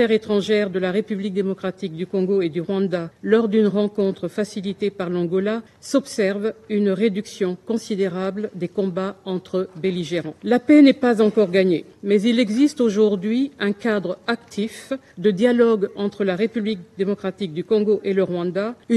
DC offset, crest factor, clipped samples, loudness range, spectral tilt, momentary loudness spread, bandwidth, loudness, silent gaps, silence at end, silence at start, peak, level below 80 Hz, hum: under 0.1%; 18 dB; under 0.1%; 6 LU; -6.5 dB/octave; 9 LU; 12 kHz; -21 LUFS; none; 0 s; 0 s; -4 dBFS; -66 dBFS; none